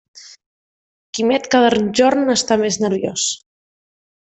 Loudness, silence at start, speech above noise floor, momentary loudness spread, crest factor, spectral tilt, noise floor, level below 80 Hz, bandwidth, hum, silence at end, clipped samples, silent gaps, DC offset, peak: -16 LUFS; 0.15 s; over 74 dB; 7 LU; 16 dB; -3 dB/octave; under -90 dBFS; -58 dBFS; 8.4 kHz; none; 0.95 s; under 0.1%; 0.46-1.13 s; under 0.1%; -2 dBFS